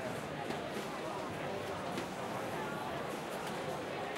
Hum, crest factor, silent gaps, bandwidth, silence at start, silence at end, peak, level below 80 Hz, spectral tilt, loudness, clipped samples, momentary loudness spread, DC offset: none; 16 dB; none; 16 kHz; 0 s; 0 s; -24 dBFS; -66 dBFS; -4.5 dB/octave; -40 LUFS; under 0.1%; 1 LU; under 0.1%